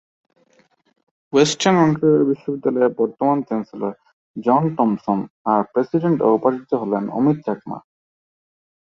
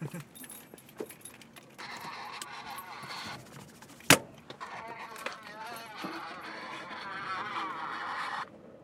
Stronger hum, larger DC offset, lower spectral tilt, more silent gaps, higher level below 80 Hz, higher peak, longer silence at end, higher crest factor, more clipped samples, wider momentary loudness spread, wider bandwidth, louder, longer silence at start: neither; neither; first, -6 dB/octave vs -2.5 dB/octave; first, 4.13-4.34 s, 5.30-5.45 s vs none; first, -64 dBFS vs -76 dBFS; about the same, -2 dBFS vs -4 dBFS; first, 1.2 s vs 0 s; second, 18 dB vs 34 dB; neither; about the same, 12 LU vs 13 LU; second, 8.2 kHz vs 18 kHz; first, -19 LUFS vs -35 LUFS; first, 1.35 s vs 0 s